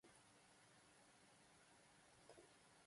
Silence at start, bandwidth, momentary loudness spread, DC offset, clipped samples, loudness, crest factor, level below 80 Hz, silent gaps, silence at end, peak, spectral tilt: 0.05 s; 11.5 kHz; 3 LU; under 0.1%; under 0.1%; -69 LUFS; 22 dB; under -90 dBFS; none; 0 s; -50 dBFS; -2.5 dB/octave